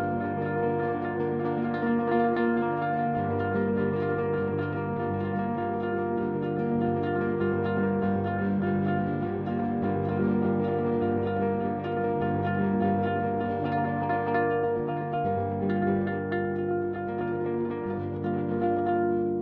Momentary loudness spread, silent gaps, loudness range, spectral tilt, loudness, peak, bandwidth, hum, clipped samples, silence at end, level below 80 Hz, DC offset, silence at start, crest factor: 4 LU; none; 2 LU; -11 dB/octave; -28 LUFS; -12 dBFS; 4.8 kHz; none; under 0.1%; 0 s; -60 dBFS; under 0.1%; 0 s; 14 dB